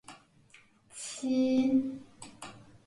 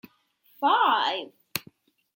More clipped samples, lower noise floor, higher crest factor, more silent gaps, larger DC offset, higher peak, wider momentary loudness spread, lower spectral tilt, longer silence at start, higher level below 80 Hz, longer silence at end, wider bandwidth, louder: neither; about the same, -61 dBFS vs -64 dBFS; second, 16 dB vs 24 dB; neither; neither; second, -18 dBFS vs -4 dBFS; first, 23 LU vs 14 LU; first, -4.5 dB/octave vs -2 dB/octave; second, 0.1 s vs 0.6 s; first, -70 dBFS vs -78 dBFS; second, 0.3 s vs 0.55 s; second, 11.5 kHz vs 16.5 kHz; second, -30 LUFS vs -25 LUFS